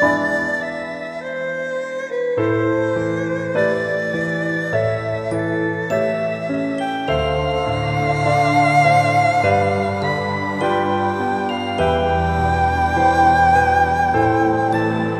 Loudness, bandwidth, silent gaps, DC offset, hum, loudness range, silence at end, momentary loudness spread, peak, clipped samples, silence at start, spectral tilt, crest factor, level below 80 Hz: -18 LUFS; 13.5 kHz; none; under 0.1%; none; 5 LU; 0 s; 9 LU; -2 dBFS; under 0.1%; 0 s; -6.5 dB/octave; 16 dB; -38 dBFS